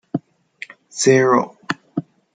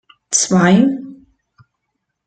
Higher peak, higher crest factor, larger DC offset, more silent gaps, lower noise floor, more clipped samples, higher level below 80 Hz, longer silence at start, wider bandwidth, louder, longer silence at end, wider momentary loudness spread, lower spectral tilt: about the same, -2 dBFS vs -2 dBFS; about the same, 18 dB vs 16 dB; neither; neither; second, -41 dBFS vs -74 dBFS; neither; second, -66 dBFS vs -56 dBFS; second, 0.15 s vs 0.3 s; about the same, 9.4 kHz vs 9.4 kHz; second, -19 LUFS vs -14 LUFS; second, 0.35 s vs 1.1 s; first, 22 LU vs 7 LU; about the same, -4.5 dB/octave vs -4.5 dB/octave